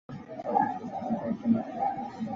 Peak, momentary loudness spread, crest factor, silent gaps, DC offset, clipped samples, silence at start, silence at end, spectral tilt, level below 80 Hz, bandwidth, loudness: -12 dBFS; 8 LU; 18 dB; none; under 0.1%; under 0.1%; 0.1 s; 0 s; -8.5 dB/octave; -66 dBFS; 6.8 kHz; -31 LUFS